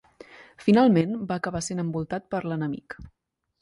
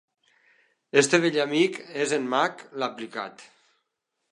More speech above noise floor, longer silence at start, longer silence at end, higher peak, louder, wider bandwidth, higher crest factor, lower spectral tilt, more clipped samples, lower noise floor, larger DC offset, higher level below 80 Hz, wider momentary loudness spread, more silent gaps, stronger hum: second, 25 dB vs 55 dB; second, 0.35 s vs 0.95 s; second, 0.55 s vs 0.9 s; second, -8 dBFS vs -4 dBFS; about the same, -25 LUFS vs -25 LUFS; about the same, 11.5 kHz vs 11.5 kHz; second, 18 dB vs 24 dB; first, -6.5 dB/octave vs -3.5 dB/octave; neither; second, -49 dBFS vs -80 dBFS; neither; first, -56 dBFS vs -84 dBFS; about the same, 15 LU vs 14 LU; neither; neither